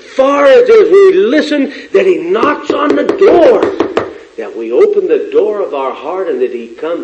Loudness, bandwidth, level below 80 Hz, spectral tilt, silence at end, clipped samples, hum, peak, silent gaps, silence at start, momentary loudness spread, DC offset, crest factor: -10 LUFS; 8.4 kHz; -50 dBFS; -5 dB/octave; 0 s; 0.8%; none; 0 dBFS; none; 0.1 s; 13 LU; under 0.1%; 10 dB